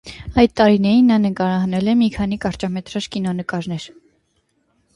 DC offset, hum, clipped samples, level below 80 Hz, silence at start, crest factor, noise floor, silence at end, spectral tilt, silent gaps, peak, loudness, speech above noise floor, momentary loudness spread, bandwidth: under 0.1%; none; under 0.1%; -42 dBFS; 0.05 s; 18 dB; -65 dBFS; 1.1 s; -7 dB/octave; none; 0 dBFS; -18 LUFS; 48 dB; 12 LU; 11.5 kHz